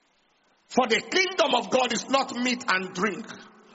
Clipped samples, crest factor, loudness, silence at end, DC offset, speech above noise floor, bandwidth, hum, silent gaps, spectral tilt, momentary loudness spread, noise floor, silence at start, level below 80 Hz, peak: under 0.1%; 20 dB; -25 LUFS; 0.25 s; under 0.1%; 41 dB; 8 kHz; none; none; -1 dB/octave; 8 LU; -66 dBFS; 0.7 s; -70 dBFS; -8 dBFS